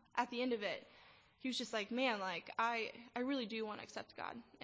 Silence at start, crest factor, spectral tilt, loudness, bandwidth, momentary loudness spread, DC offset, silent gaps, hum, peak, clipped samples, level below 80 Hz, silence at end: 0.15 s; 20 dB; -3.5 dB/octave; -41 LUFS; 8 kHz; 11 LU; under 0.1%; none; none; -22 dBFS; under 0.1%; -82 dBFS; 0 s